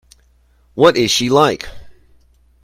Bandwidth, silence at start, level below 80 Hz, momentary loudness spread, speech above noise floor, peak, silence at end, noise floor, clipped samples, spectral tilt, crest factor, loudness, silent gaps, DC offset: 16 kHz; 0.75 s; -46 dBFS; 19 LU; 40 dB; 0 dBFS; 0.75 s; -54 dBFS; under 0.1%; -4 dB/octave; 18 dB; -13 LUFS; none; under 0.1%